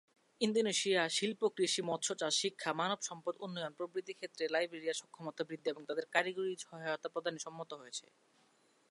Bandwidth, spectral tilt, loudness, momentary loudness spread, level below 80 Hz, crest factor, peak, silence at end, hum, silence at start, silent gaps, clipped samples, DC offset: 11.5 kHz; -2.5 dB/octave; -37 LUFS; 12 LU; under -90 dBFS; 24 dB; -14 dBFS; 0.9 s; none; 0.4 s; none; under 0.1%; under 0.1%